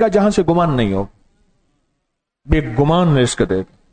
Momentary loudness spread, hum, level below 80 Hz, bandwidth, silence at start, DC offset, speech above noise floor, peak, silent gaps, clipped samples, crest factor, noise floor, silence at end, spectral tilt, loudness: 8 LU; none; -32 dBFS; 9.4 kHz; 0 s; under 0.1%; 59 dB; -4 dBFS; none; under 0.1%; 14 dB; -73 dBFS; 0.3 s; -6.5 dB/octave; -16 LUFS